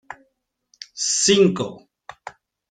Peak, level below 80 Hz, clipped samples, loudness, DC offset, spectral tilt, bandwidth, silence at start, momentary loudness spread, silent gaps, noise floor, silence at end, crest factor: -4 dBFS; -62 dBFS; under 0.1%; -18 LUFS; under 0.1%; -3 dB/octave; 9.6 kHz; 0.1 s; 26 LU; none; -70 dBFS; 0.4 s; 20 dB